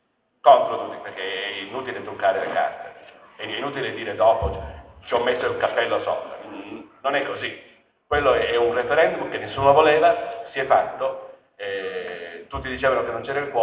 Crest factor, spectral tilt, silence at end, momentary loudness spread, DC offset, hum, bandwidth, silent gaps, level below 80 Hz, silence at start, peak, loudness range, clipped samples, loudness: 22 dB; -8.5 dB/octave; 0 s; 18 LU; under 0.1%; none; 4 kHz; none; -46 dBFS; 0.45 s; -2 dBFS; 5 LU; under 0.1%; -22 LUFS